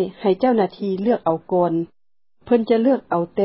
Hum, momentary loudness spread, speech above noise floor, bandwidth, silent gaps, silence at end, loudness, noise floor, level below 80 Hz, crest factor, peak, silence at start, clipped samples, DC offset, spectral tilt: none; 5 LU; 55 dB; 5.8 kHz; none; 0 s; -20 LUFS; -74 dBFS; -62 dBFS; 16 dB; -4 dBFS; 0 s; under 0.1%; 0.1%; -12 dB/octave